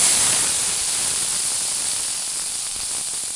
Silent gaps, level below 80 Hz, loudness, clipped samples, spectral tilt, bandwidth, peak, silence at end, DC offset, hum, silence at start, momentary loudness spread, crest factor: none; -54 dBFS; -19 LUFS; under 0.1%; 1 dB/octave; 11.5 kHz; -2 dBFS; 0 s; under 0.1%; none; 0 s; 8 LU; 20 dB